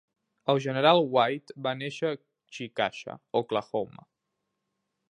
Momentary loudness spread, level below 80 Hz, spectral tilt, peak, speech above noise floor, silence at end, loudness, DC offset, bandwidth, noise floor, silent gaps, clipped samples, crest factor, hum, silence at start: 18 LU; -76 dBFS; -5.5 dB/octave; -6 dBFS; 55 dB; 1.2 s; -28 LUFS; under 0.1%; 10.5 kHz; -82 dBFS; none; under 0.1%; 22 dB; none; 0.45 s